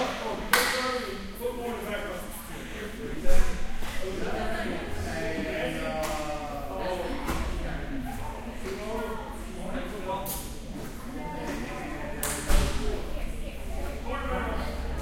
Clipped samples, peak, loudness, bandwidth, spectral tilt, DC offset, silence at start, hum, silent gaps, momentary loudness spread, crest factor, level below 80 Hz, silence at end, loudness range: under 0.1%; -2 dBFS; -32 LUFS; 16.5 kHz; -4 dB/octave; under 0.1%; 0 s; none; none; 10 LU; 26 dB; -34 dBFS; 0 s; 3 LU